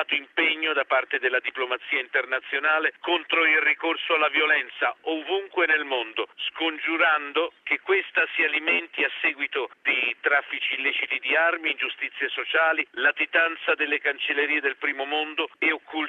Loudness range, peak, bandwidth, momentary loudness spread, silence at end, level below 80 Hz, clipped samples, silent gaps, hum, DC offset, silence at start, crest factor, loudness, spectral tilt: 2 LU; -8 dBFS; 7.2 kHz; 7 LU; 0 s; -78 dBFS; under 0.1%; none; none; under 0.1%; 0 s; 16 dB; -23 LUFS; -3 dB/octave